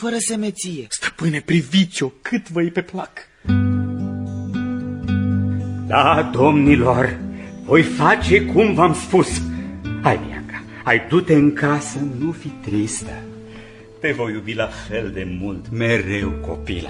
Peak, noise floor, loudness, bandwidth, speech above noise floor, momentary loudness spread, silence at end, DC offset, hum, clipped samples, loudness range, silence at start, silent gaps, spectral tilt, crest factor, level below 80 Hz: 0 dBFS; -39 dBFS; -19 LUFS; 11.5 kHz; 21 dB; 15 LU; 0 s; under 0.1%; none; under 0.1%; 9 LU; 0 s; none; -5.5 dB/octave; 18 dB; -38 dBFS